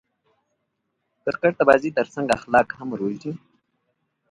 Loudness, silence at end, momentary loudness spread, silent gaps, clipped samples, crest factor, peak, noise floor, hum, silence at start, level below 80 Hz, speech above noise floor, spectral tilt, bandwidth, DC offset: -22 LUFS; 0.95 s; 15 LU; none; under 0.1%; 24 dB; 0 dBFS; -76 dBFS; none; 1.25 s; -60 dBFS; 55 dB; -6 dB/octave; 11.5 kHz; under 0.1%